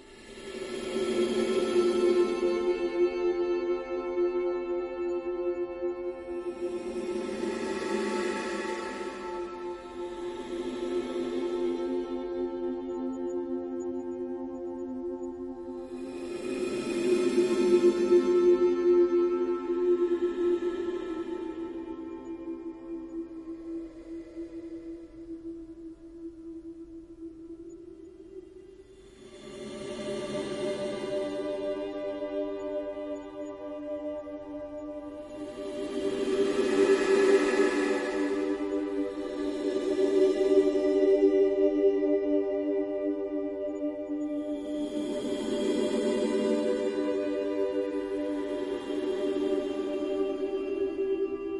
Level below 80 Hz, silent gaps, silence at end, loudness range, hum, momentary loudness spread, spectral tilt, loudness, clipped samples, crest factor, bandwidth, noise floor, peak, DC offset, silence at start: -60 dBFS; none; 0 s; 15 LU; none; 17 LU; -5 dB/octave; -30 LUFS; under 0.1%; 18 dB; 11.5 kHz; -51 dBFS; -12 dBFS; under 0.1%; 0 s